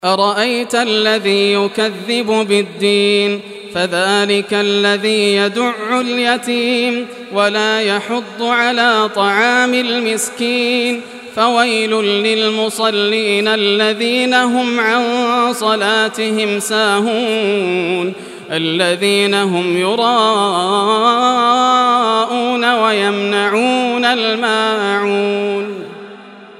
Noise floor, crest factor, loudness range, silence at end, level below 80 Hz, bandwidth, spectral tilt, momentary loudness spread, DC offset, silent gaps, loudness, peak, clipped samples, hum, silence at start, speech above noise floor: -36 dBFS; 14 dB; 2 LU; 0.05 s; -70 dBFS; 13.5 kHz; -3.5 dB/octave; 6 LU; under 0.1%; none; -14 LUFS; 0 dBFS; under 0.1%; none; 0.05 s; 21 dB